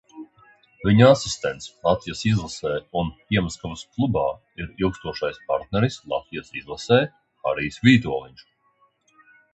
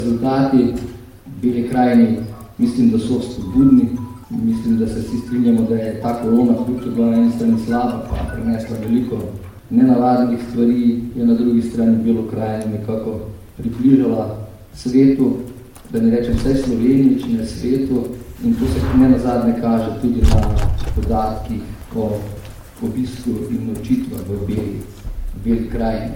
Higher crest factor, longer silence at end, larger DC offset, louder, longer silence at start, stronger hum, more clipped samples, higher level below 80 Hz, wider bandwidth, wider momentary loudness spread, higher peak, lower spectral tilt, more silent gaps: first, 22 dB vs 16 dB; first, 1.25 s vs 0 s; neither; second, -23 LUFS vs -18 LUFS; first, 0.15 s vs 0 s; neither; neither; second, -46 dBFS vs -28 dBFS; second, 8.4 kHz vs 16 kHz; about the same, 16 LU vs 14 LU; about the same, -2 dBFS vs -2 dBFS; second, -6 dB/octave vs -8 dB/octave; neither